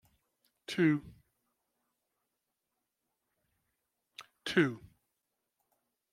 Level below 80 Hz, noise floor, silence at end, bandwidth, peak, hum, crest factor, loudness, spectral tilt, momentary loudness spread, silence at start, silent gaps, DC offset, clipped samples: -74 dBFS; -86 dBFS; 1.35 s; 14 kHz; -14 dBFS; none; 26 dB; -32 LUFS; -6 dB/octave; 23 LU; 0.7 s; none; under 0.1%; under 0.1%